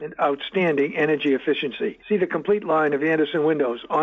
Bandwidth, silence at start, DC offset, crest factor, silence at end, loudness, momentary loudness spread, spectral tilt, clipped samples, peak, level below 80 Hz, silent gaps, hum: 6.4 kHz; 0 s; under 0.1%; 12 dB; 0 s; -22 LUFS; 4 LU; -7.5 dB/octave; under 0.1%; -10 dBFS; -64 dBFS; none; none